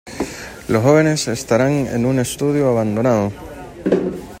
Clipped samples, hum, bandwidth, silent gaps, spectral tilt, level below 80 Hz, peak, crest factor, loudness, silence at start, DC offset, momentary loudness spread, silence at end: under 0.1%; none; 16.5 kHz; none; -6 dB/octave; -44 dBFS; -2 dBFS; 16 dB; -18 LUFS; 0.05 s; under 0.1%; 13 LU; 0 s